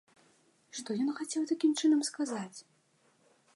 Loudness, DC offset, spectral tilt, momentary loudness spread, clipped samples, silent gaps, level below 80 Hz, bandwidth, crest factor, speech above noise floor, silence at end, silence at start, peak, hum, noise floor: -32 LUFS; under 0.1%; -3.5 dB/octave; 17 LU; under 0.1%; none; -90 dBFS; 11.5 kHz; 16 dB; 38 dB; 0.95 s; 0.75 s; -18 dBFS; none; -70 dBFS